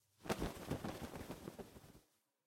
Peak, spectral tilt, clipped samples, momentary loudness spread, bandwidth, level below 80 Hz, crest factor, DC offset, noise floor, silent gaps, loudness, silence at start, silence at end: -22 dBFS; -5 dB/octave; under 0.1%; 15 LU; 16.5 kHz; -60 dBFS; 26 dB; under 0.1%; -73 dBFS; none; -47 LUFS; 0.2 s; 0.45 s